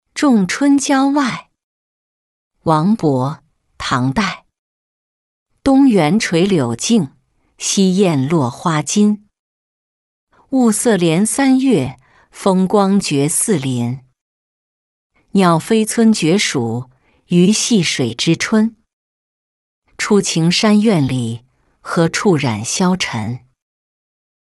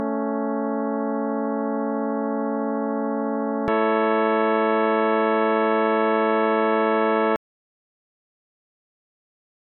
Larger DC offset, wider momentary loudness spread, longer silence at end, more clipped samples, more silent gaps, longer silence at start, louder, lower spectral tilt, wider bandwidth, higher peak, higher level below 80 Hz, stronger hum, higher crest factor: neither; first, 11 LU vs 5 LU; second, 1.1 s vs 2.35 s; neither; first, 1.64-2.51 s, 4.58-5.46 s, 9.39-10.27 s, 14.21-15.10 s, 18.93-19.82 s vs none; first, 0.15 s vs 0 s; first, -15 LUFS vs -22 LUFS; second, -5 dB/octave vs -8.5 dB/octave; first, 12 kHz vs 4.1 kHz; first, -2 dBFS vs -10 dBFS; first, -50 dBFS vs -64 dBFS; neither; about the same, 14 dB vs 14 dB